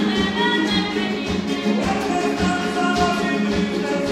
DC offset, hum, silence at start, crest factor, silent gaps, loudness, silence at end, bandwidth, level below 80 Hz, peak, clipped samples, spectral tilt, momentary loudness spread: under 0.1%; none; 0 s; 16 dB; none; -20 LUFS; 0 s; 13.5 kHz; -42 dBFS; -6 dBFS; under 0.1%; -5 dB/octave; 4 LU